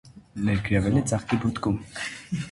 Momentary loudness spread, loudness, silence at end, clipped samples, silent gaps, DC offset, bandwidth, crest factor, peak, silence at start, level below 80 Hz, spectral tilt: 11 LU; -26 LUFS; 0 s; under 0.1%; none; under 0.1%; 11.5 kHz; 16 dB; -10 dBFS; 0.05 s; -44 dBFS; -6 dB/octave